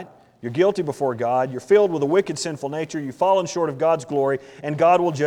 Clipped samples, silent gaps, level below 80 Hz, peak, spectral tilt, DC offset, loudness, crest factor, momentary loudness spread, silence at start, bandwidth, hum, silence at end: under 0.1%; none; -66 dBFS; -6 dBFS; -5.5 dB/octave; under 0.1%; -21 LUFS; 16 dB; 10 LU; 0 s; 11.5 kHz; none; 0 s